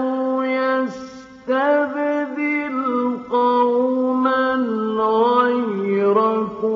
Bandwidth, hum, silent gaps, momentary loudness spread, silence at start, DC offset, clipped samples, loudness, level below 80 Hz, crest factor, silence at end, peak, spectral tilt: 7.2 kHz; none; none; 6 LU; 0 s; under 0.1%; under 0.1%; -19 LUFS; -64 dBFS; 14 dB; 0 s; -4 dBFS; -4 dB/octave